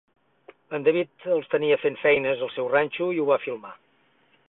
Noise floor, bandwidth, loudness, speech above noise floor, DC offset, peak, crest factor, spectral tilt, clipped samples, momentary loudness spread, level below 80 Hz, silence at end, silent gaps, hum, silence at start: -64 dBFS; 4.1 kHz; -24 LUFS; 40 dB; under 0.1%; -8 dBFS; 18 dB; -9.5 dB/octave; under 0.1%; 11 LU; -70 dBFS; 0.75 s; none; none; 0.7 s